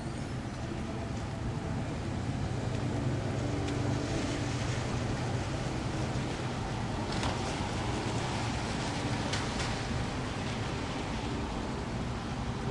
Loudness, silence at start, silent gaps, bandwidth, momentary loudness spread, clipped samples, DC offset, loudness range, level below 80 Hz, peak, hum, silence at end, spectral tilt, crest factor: -34 LUFS; 0 s; none; 11.5 kHz; 4 LU; under 0.1%; under 0.1%; 2 LU; -44 dBFS; -18 dBFS; none; 0 s; -5.5 dB/octave; 16 dB